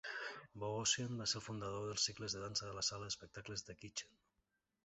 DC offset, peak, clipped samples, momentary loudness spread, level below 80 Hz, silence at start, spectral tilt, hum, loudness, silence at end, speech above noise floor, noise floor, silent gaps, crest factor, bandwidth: under 0.1%; -22 dBFS; under 0.1%; 11 LU; -70 dBFS; 0.05 s; -2 dB/octave; none; -42 LUFS; 0.75 s; 43 dB; -86 dBFS; none; 22 dB; 8.2 kHz